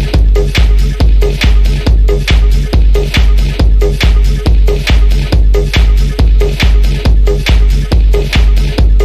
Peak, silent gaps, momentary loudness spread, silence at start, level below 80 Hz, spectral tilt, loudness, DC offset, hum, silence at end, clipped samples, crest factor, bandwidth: 0 dBFS; none; 1 LU; 0 s; -8 dBFS; -6 dB/octave; -11 LUFS; under 0.1%; none; 0 s; under 0.1%; 6 dB; 14 kHz